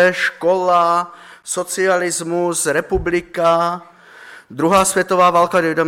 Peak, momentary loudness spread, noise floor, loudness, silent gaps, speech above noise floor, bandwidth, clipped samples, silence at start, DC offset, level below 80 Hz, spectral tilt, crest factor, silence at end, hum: -4 dBFS; 10 LU; -41 dBFS; -16 LUFS; none; 24 dB; 16.5 kHz; under 0.1%; 0 s; under 0.1%; -42 dBFS; -3.5 dB/octave; 14 dB; 0 s; none